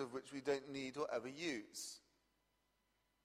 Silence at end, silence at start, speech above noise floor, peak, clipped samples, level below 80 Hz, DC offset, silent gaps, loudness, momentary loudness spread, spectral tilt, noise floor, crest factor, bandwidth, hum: 1.25 s; 0 s; 38 dB; -26 dBFS; under 0.1%; -84 dBFS; under 0.1%; none; -45 LUFS; 7 LU; -3.5 dB/octave; -83 dBFS; 22 dB; 15.5 kHz; 50 Hz at -85 dBFS